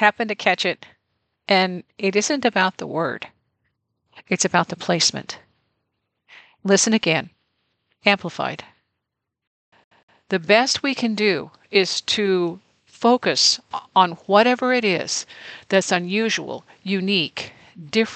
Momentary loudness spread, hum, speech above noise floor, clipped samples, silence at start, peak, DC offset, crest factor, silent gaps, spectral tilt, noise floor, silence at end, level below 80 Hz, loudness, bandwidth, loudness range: 16 LU; none; 60 dB; under 0.1%; 0 s; -2 dBFS; under 0.1%; 20 dB; 9.47-9.72 s, 9.84-9.91 s, 10.03-10.08 s; -3 dB/octave; -81 dBFS; 0 s; -70 dBFS; -20 LUFS; 9.2 kHz; 5 LU